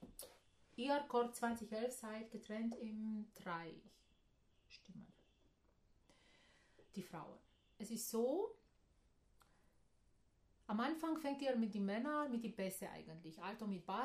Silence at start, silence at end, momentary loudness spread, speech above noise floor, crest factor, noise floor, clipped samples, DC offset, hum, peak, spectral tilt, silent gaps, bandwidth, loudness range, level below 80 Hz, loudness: 0 s; 0 s; 19 LU; 32 dB; 18 dB; -76 dBFS; under 0.1%; under 0.1%; none; -28 dBFS; -5 dB/octave; none; 15 kHz; 16 LU; -78 dBFS; -44 LUFS